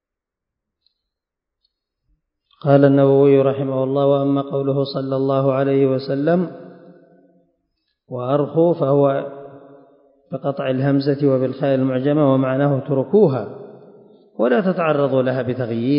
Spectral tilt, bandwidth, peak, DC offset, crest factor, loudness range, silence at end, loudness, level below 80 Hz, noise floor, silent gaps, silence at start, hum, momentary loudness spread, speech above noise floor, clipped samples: -13 dB/octave; 5.4 kHz; 0 dBFS; under 0.1%; 18 dB; 5 LU; 0 s; -18 LUFS; -68 dBFS; -84 dBFS; none; 2.65 s; none; 12 LU; 67 dB; under 0.1%